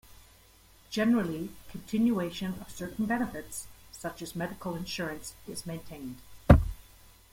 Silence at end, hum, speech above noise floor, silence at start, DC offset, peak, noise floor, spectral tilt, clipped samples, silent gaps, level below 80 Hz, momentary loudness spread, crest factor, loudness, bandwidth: 0.5 s; none; 26 dB; 0.1 s; under 0.1%; -4 dBFS; -58 dBFS; -6 dB/octave; under 0.1%; none; -40 dBFS; 19 LU; 28 dB; -31 LUFS; 16.5 kHz